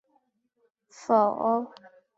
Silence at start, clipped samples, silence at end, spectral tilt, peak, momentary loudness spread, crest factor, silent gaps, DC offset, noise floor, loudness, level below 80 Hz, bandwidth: 1 s; under 0.1%; 0.5 s; -6.5 dB/octave; -10 dBFS; 19 LU; 20 dB; none; under 0.1%; -72 dBFS; -25 LUFS; -80 dBFS; 8 kHz